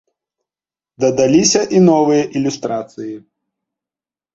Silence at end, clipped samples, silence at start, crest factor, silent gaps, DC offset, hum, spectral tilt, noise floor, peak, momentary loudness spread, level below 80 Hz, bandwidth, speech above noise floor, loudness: 1.15 s; under 0.1%; 1 s; 16 dB; none; under 0.1%; none; -4.5 dB/octave; under -90 dBFS; -2 dBFS; 17 LU; -56 dBFS; 8 kHz; over 76 dB; -14 LUFS